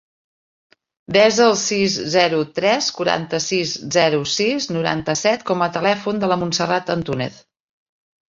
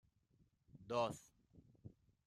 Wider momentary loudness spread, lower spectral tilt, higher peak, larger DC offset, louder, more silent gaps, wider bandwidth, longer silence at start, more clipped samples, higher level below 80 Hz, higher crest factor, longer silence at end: second, 6 LU vs 22 LU; second, -3.5 dB/octave vs -5 dB/octave; first, -2 dBFS vs -26 dBFS; neither; first, -18 LUFS vs -44 LUFS; neither; second, 7.8 kHz vs 13.5 kHz; first, 1.1 s vs 0.75 s; neither; first, -58 dBFS vs -78 dBFS; about the same, 18 dB vs 22 dB; first, 1 s vs 0.4 s